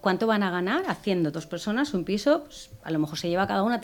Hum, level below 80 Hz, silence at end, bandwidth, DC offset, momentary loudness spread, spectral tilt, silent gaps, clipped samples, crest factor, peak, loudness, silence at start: none; -58 dBFS; 0 s; 19 kHz; under 0.1%; 7 LU; -5.5 dB/octave; none; under 0.1%; 18 dB; -8 dBFS; -26 LUFS; 0.05 s